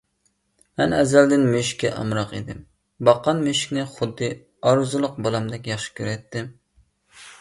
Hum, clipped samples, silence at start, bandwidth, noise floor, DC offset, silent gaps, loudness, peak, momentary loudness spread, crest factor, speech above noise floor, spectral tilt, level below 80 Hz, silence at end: none; under 0.1%; 0.8 s; 11.5 kHz; -69 dBFS; under 0.1%; none; -22 LUFS; -2 dBFS; 16 LU; 22 dB; 48 dB; -5 dB/octave; -54 dBFS; 0.05 s